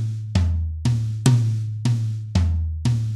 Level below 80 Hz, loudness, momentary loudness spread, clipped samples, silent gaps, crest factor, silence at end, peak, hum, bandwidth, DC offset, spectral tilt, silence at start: -32 dBFS; -22 LUFS; 5 LU; under 0.1%; none; 18 dB; 0 s; -4 dBFS; none; 12 kHz; under 0.1%; -6.5 dB/octave; 0 s